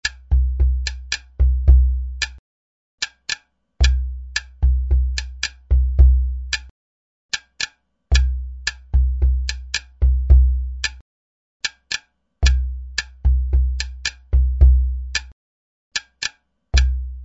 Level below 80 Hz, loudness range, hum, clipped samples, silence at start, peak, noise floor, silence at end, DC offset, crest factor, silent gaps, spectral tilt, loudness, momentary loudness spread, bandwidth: -20 dBFS; 3 LU; none; under 0.1%; 0.05 s; 0 dBFS; under -90 dBFS; 0 s; under 0.1%; 18 dB; 2.39-2.98 s, 6.71-7.29 s, 11.01-11.60 s, 15.32-15.91 s; -3.5 dB/octave; -21 LUFS; 12 LU; 8 kHz